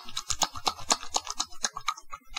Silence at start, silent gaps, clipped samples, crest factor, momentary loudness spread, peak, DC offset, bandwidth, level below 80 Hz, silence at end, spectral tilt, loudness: 0 s; none; under 0.1%; 28 dB; 7 LU; -4 dBFS; under 0.1%; 18 kHz; -50 dBFS; 0 s; 0 dB/octave; -30 LUFS